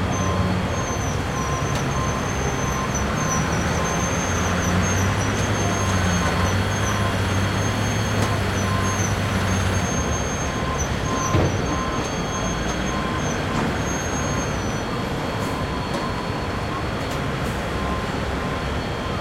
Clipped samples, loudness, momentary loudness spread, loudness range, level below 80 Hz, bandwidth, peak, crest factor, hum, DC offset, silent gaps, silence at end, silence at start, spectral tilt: under 0.1%; -23 LUFS; 5 LU; 4 LU; -34 dBFS; 16.5 kHz; -6 dBFS; 16 dB; none; under 0.1%; none; 0 s; 0 s; -4.5 dB/octave